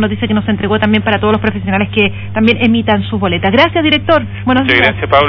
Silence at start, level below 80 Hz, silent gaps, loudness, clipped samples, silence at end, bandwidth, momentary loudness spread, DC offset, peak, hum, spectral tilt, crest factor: 0 s; -36 dBFS; none; -12 LUFS; 0.4%; 0 s; 5.4 kHz; 5 LU; under 0.1%; 0 dBFS; none; -8 dB/octave; 12 dB